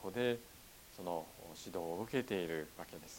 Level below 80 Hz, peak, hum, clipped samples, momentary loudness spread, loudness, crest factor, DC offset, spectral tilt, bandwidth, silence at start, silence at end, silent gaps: -68 dBFS; -22 dBFS; none; under 0.1%; 15 LU; -42 LUFS; 20 dB; under 0.1%; -5 dB/octave; 17.5 kHz; 0 s; 0 s; none